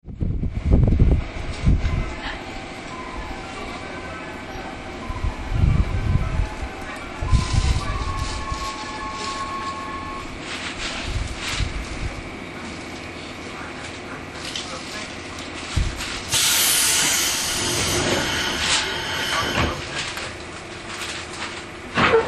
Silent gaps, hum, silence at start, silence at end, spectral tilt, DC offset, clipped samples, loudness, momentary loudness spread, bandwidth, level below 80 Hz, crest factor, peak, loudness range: none; none; 0.05 s; 0 s; -3 dB/octave; under 0.1%; under 0.1%; -24 LUFS; 14 LU; 13 kHz; -28 dBFS; 20 dB; -4 dBFS; 12 LU